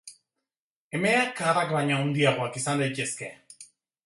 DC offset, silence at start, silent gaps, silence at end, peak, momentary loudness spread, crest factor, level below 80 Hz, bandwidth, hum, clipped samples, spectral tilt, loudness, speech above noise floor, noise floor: under 0.1%; 0.05 s; 0.57-0.90 s; 0.4 s; -8 dBFS; 12 LU; 20 dB; -70 dBFS; 11.5 kHz; none; under 0.1%; -4.5 dB/octave; -26 LUFS; over 64 dB; under -90 dBFS